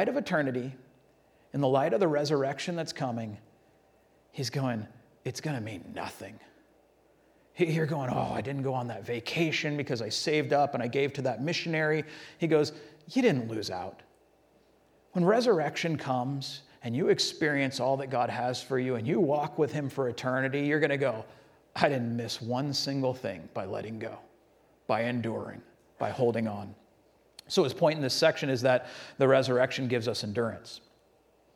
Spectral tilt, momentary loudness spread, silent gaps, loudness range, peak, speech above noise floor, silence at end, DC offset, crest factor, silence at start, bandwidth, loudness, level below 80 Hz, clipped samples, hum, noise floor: -5.5 dB/octave; 14 LU; none; 7 LU; -6 dBFS; 36 dB; 0.8 s; under 0.1%; 24 dB; 0 s; 16.5 kHz; -30 LUFS; -70 dBFS; under 0.1%; none; -65 dBFS